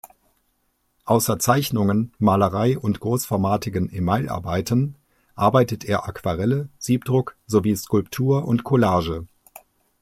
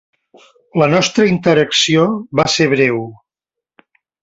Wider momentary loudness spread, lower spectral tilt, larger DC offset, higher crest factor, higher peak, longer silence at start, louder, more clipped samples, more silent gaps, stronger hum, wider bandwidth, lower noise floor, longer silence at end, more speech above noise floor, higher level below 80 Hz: about the same, 7 LU vs 7 LU; first, -6 dB/octave vs -4.5 dB/octave; neither; about the same, 20 dB vs 16 dB; about the same, -2 dBFS vs 0 dBFS; second, 0.05 s vs 0.75 s; second, -22 LUFS vs -14 LUFS; neither; neither; neither; first, 16 kHz vs 8.2 kHz; second, -69 dBFS vs -84 dBFS; second, 0.75 s vs 1.1 s; second, 48 dB vs 70 dB; about the same, -50 dBFS vs -52 dBFS